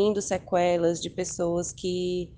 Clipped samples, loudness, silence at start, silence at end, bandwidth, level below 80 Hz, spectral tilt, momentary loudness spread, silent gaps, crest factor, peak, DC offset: under 0.1%; -27 LUFS; 0 s; 0 s; 10 kHz; -54 dBFS; -4.5 dB/octave; 6 LU; none; 14 dB; -12 dBFS; under 0.1%